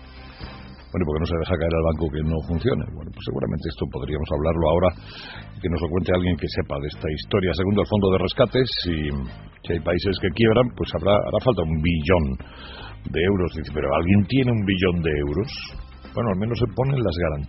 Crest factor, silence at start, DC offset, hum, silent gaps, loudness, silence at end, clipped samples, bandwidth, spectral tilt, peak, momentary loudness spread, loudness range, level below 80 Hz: 20 dB; 0 s; under 0.1%; none; none; -23 LUFS; 0 s; under 0.1%; 6 kHz; -6 dB/octave; -2 dBFS; 16 LU; 3 LU; -36 dBFS